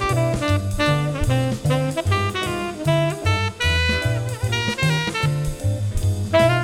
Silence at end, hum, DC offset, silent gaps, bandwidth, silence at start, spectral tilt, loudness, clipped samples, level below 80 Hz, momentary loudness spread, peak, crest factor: 0 s; none; under 0.1%; none; 16 kHz; 0 s; -5.5 dB/octave; -21 LUFS; under 0.1%; -34 dBFS; 5 LU; -4 dBFS; 16 dB